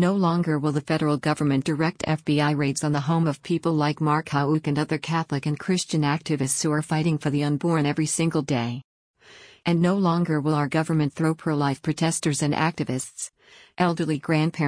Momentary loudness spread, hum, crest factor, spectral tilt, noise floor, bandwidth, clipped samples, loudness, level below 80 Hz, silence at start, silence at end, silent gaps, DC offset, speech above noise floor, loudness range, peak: 4 LU; none; 14 dB; -5.5 dB/octave; -50 dBFS; 10.5 kHz; under 0.1%; -24 LUFS; -60 dBFS; 0 s; 0 s; 8.84-9.14 s; under 0.1%; 27 dB; 2 LU; -10 dBFS